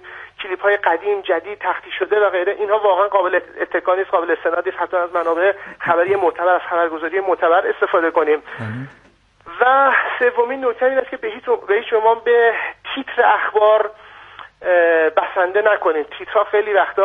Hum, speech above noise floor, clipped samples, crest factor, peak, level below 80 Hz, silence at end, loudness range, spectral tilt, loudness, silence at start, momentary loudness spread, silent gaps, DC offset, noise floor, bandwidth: none; 23 dB; under 0.1%; 16 dB; -2 dBFS; -62 dBFS; 0 s; 2 LU; -6.5 dB/octave; -17 LUFS; 0.05 s; 10 LU; none; under 0.1%; -40 dBFS; 4 kHz